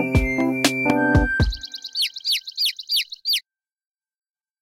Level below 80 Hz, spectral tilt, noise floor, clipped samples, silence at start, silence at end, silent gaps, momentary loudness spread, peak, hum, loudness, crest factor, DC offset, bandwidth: -32 dBFS; -4 dB/octave; -46 dBFS; under 0.1%; 0 s; 1.2 s; none; 5 LU; -2 dBFS; none; -21 LUFS; 22 dB; under 0.1%; 16.5 kHz